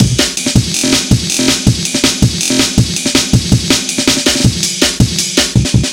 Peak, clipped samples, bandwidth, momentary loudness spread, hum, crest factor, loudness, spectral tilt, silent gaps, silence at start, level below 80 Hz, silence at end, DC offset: 0 dBFS; 0.5%; 17.5 kHz; 2 LU; none; 12 dB; -11 LUFS; -3.5 dB/octave; none; 0 s; -26 dBFS; 0 s; 0.1%